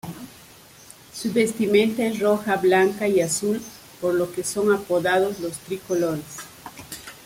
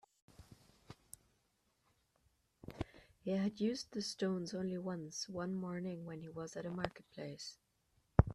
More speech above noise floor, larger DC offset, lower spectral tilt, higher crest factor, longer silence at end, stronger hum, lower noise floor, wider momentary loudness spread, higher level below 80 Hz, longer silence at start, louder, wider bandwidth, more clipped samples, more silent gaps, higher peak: second, 26 dB vs 38 dB; neither; second, -4.5 dB/octave vs -6 dB/octave; second, 18 dB vs 32 dB; about the same, 0.1 s vs 0 s; neither; second, -48 dBFS vs -80 dBFS; about the same, 18 LU vs 20 LU; second, -60 dBFS vs -54 dBFS; second, 0.05 s vs 0.4 s; first, -22 LUFS vs -42 LUFS; first, 16.5 kHz vs 13 kHz; neither; neither; first, -6 dBFS vs -10 dBFS